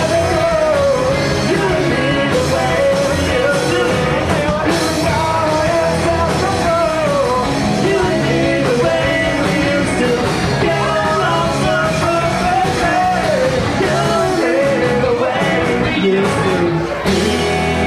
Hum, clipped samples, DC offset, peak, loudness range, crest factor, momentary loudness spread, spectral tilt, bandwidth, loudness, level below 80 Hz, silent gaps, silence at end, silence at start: none; under 0.1%; under 0.1%; -4 dBFS; 0 LU; 10 dB; 1 LU; -5 dB/octave; 15 kHz; -15 LUFS; -34 dBFS; none; 0 s; 0 s